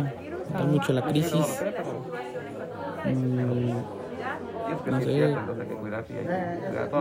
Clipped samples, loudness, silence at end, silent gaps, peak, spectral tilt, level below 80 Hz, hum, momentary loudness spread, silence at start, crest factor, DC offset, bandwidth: under 0.1%; -29 LUFS; 0 s; none; -10 dBFS; -7 dB/octave; -62 dBFS; none; 10 LU; 0 s; 18 dB; under 0.1%; 16 kHz